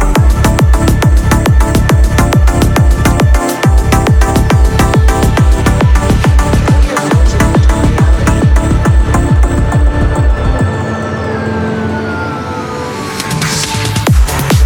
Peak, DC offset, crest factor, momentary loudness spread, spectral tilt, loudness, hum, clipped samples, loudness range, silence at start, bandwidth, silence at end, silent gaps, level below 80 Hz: 0 dBFS; under 0.1%; 8 dB; 7 LU; -6 dB/octave; -10 LUFS; none; under 0.1%; 5 LU; 0 s; 17.5 kHz; 0 s; none; -12 dBFS